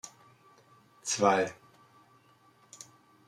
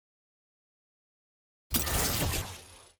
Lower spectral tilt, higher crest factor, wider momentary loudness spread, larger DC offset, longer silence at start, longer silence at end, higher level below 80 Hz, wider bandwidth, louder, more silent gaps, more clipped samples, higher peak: about the same, -3 dB/octave vs -3 dB/octave; about the same, 24 dB vs 24 dB; first, 24 LU vs 14 LU; neither; second, 0.05 s vs 1.7 s; first, 1.75 s vs 0.15 s; second, -80 dBFS vs -44 dBFS; second, 14.5 kHz vs over 20 kHz; about the same, -29 LUFS vs -30 LUFS; neither; neither; about the same, -10 dBFS vs -12 dBFS